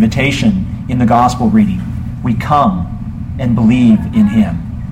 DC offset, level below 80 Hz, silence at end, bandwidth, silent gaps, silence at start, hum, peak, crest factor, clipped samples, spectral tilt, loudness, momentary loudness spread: under 0.1%; -28 dBFS; 0 s; 10 kHz; none; 0 s; none; 0 dBFS; 12 dB; under 0.1%; -7 dB/octave; -13 LUFS; 11 LU